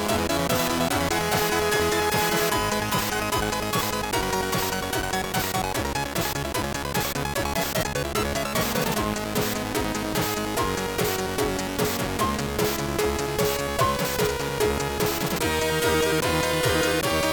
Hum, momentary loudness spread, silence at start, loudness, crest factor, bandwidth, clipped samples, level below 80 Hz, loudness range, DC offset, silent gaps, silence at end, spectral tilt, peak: none; 4 LU; 0 s; -24 LUFS; 16 dB; 19 kHz; under 0.1%; -40 dBFS; 3 LU; under 0.1%; none; 0 s; -3.5 dB/octave; -8 dBFS